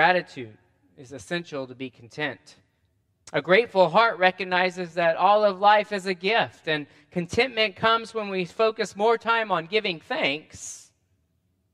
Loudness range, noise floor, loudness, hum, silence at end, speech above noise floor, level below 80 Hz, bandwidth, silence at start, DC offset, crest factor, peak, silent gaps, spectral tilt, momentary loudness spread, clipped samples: 6 LU; -71 dBFS; -23 LUFS; none; 0.95 s; 46 dB; -64 dBFS; 12 kHz; 0 s; under 0.1%; 22 dB; -4 dBFS; none; -4 dB/octave; 18 LU; under 0.1%